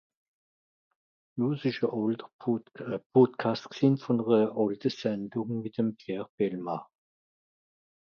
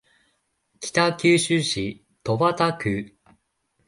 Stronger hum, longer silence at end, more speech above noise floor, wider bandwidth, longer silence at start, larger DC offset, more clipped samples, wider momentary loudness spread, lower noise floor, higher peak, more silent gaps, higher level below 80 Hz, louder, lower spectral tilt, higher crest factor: neither; first, 1.25 s vs 0.8 s; first, over 62 dB vs 49 dB; second, 6.8 kHz vs 11.5 kHz; first, 1.35 s vs 0.8 s; neither; neither; second, 12 LU vs 15 LU; first, under -90 dBFS vs -71 dBFS; second, -10 dBFS vs -6 dBFS; first, 2.33-2.39 s, 3.06-3.10 s, 6.29-6.38 s vs none; second, -76 dBFS vs -56 dBFS; second, -29 LUFS vs -22 LUFS; first, -8 dB/octave vs -4.5 dB/octave; about the same, 20 dB vs 18 dB